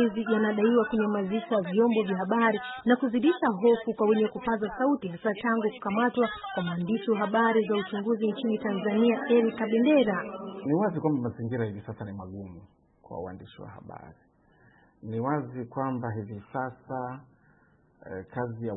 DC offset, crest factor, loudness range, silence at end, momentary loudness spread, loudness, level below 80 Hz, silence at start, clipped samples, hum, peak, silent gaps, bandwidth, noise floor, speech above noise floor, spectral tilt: under 0.1%; 16 dB; 12 LU; 0 s; 16 LU; -27 LUFS; -64 dBFS; 0 s; under 0.1%; none; -12 dBFS; none; 4 kHz; -63 dBFS; 36 dB; -11 dB/octave